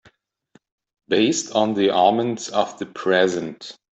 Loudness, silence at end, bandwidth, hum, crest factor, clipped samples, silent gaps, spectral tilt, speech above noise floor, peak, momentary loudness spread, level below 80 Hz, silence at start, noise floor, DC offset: -20 LUFS; 0.25 s; 8.4 kHz; none; 18 dB; under 0.1%; none; -4 dB/octave; 39 dB; -4 dBFS; 10 LU; -66 dBFS; 1.1 s; -59 dBFS; under 0.1%